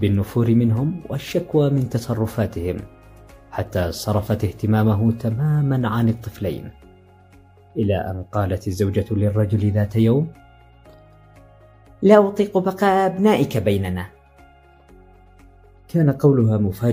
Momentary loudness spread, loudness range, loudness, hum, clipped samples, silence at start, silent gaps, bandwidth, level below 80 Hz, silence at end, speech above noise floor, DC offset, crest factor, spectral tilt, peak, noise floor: 11 LU; 5 LU; -20 LUFS; none; under 0.1%; 0 s; none; 16 kHz; -48 dBFS; 0 s; 31 dB; under 0.1%; 20 dB; -8 dB/octave; 0 dBFS; -49 dBFS